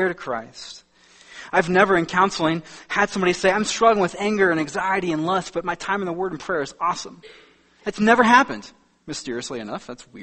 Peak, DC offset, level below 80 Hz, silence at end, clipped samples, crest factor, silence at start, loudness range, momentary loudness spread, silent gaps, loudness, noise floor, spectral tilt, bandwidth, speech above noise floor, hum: 0 dBFS; under 0.1%; -56 dBFS; 0 s; under 0.1%; 22 dB; 0 s; 4 LU; 16 LU; none; -21 LUFS; -50 dBFS; -4.5 dB/octave; 8.8 kHz; 29 dB; none